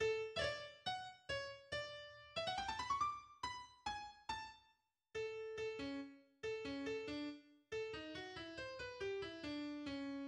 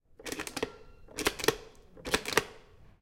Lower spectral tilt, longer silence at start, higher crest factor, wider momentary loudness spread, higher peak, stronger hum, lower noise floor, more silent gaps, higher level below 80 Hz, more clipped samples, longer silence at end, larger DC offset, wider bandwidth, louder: first, -4 dB/octave vs -2 dB/octave; second, 0 s vs 0.2 s; second, 18 dB vs 32 dB; second, 9 LU vs 16 LU; second, -28 dBFS vs -4 dBFS; neither; first, -79 dBFS vs -55 dBFS; neither; second, -70 dBFS vs -54 dBFS; neither; about the same, 0 s vs 0.1 s; neither; second, 11.5 kHz vs 17 kHz; second, -46 LUFS vs -33 LUFS